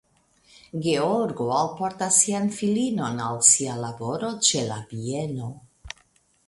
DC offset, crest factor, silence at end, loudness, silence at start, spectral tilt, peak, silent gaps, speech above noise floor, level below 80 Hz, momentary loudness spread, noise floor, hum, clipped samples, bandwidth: under 0.1%; 22 dB; 0.6 s; -23 LUFS; 0.75 s; -3 dB/octave; -4 dBFS; none; 38 dB; -60 dBFS; 18 LU; -62 dBFS; none; under 0.1%; 11.5 kHz